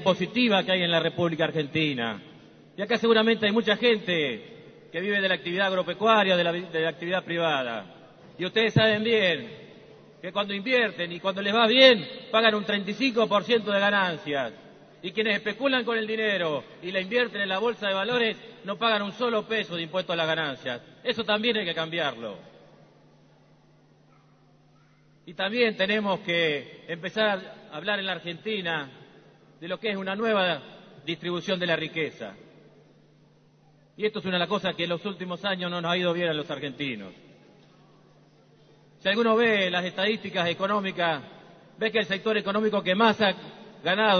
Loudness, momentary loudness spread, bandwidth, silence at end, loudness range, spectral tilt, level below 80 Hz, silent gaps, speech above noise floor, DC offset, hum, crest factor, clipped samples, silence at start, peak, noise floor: -25 LUFS; 12 LU; 6.6 kHz; 0 s; 8 LU; -5.5 dB/octave; -70 dBFS; none; 33 dB; under 0.1%; none; 24 dB; under 0.1%; 0 s; -2 dBFS; -59 dBFS